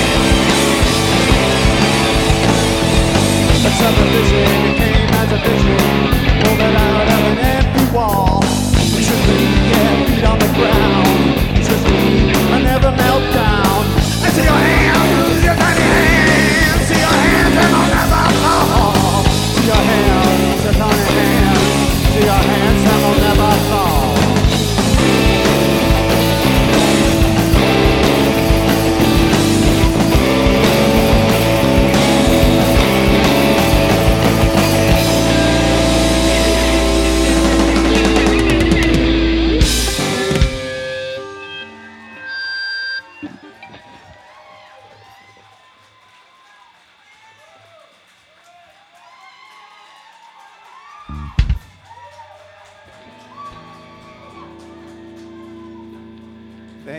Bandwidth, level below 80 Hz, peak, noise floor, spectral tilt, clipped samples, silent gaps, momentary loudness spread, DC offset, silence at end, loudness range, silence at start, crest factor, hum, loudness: 19 kHz; -22 dBFS; 0 dBFS; -50 dBFS; -5 dB/octave; under 0.1%; none; 3 LU; under 0.1%; 0 s; 15 LU; 0 s; 12 dB; none; -13 LUFS